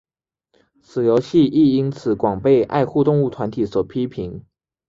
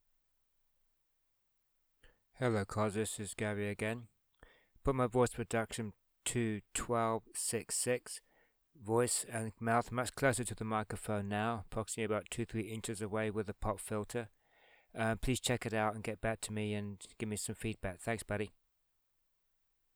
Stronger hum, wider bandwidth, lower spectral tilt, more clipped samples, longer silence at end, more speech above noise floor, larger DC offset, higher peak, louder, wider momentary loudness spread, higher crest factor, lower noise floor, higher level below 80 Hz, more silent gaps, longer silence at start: neither; second, 7.6 kHz vs over 20 kHz; first, -8.5 dB/octave vs -4.5 dB/octave; neither; second, 0.5 s vs 1.45 s; first, 51 dB vs 43 dB; neither; first, -4 dBFS vs -16 dBFS; first, -18 LUFS vs -37 LUFS; first, 11 LU vs 8 LU; second, 14 dB vs 22 dB; second, -69 dBFS vs -80 dBFS; first, -50 dBFS vs -56 dBFS; neither; second, 0.95 s vs 2.05 s